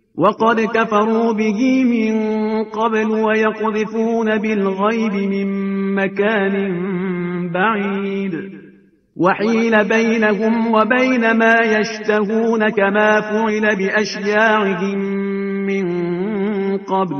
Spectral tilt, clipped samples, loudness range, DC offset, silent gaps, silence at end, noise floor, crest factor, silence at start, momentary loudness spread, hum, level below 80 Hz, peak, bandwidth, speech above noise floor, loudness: -6.5 dB/octave; under 0.1%; 4 LU; under 0.1%; none; 0 s; -48 dBFS; 16 dB; 0.15 s; 7 LU; none; -60 dBFS; 0 dBFS; 6.6 kHz; 32 dB; -17 LUFS